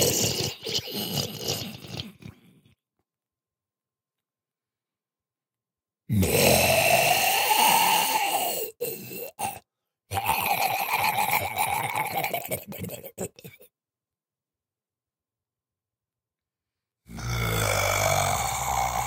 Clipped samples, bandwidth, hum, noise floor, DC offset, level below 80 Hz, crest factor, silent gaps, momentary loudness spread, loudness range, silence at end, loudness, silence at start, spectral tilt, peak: under 0.1%; 18 kHz; none; under -90 dBFS; under 0.1%; -50 dBFS; 22 dB; none; 17 LU; 19 LU; 0 s; -24 LUFS; 0 s; -2.5 dB/octave; -6 dBFS